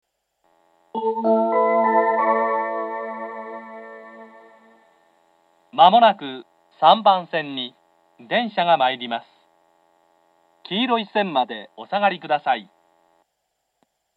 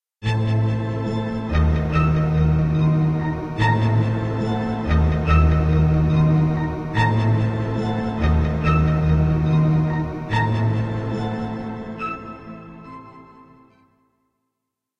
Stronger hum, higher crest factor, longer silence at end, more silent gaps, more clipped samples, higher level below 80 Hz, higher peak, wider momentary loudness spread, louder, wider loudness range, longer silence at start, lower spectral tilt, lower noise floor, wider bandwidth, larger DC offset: neither; first, 22 dB vs 14 dB; second, 1.55 s vs 1.75 s; neither; neither; second, -88 dBFS vs -28 dBFS; first, 0 dBFS vs -6 dBFS; first, 19 LU vs 11 LU; about the same, -20 LUFS vs -20 LUFS; second, 6 LU vs 10 LU; first, 0.95 s vs 0.2 s; second, -6.5 dB/octave vs -8.5 dB/octave; second, -75 dBFS vs -81 dBFS; second, 5 kHz vs 7.2 kHz; neither